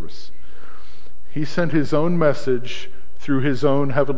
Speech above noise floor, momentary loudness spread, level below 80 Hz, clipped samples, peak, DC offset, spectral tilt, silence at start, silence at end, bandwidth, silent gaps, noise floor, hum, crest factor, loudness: 28 dB; 16 LU; -50 dBFS; under 0.1%; -4 dBFS; 10%; -7.5 dB/octave; 0 s; 0 s; 7.8 kHz; none; -48 dBFS; none; 18 dB; -21 LUFS